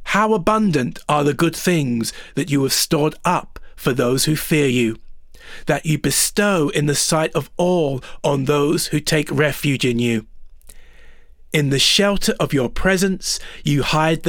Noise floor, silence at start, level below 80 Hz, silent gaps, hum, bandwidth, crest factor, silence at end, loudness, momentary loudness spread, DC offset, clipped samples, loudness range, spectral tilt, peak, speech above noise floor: -41 dBFS; 0 s; -38 dBFS; none; none; over 20 kHz; 14 dB; 0 s; -18 LUFS; 7 LU; under 0.1%; under 0.1%; 2 LU; -4 dB/octave; -4 dBFS; 23 dB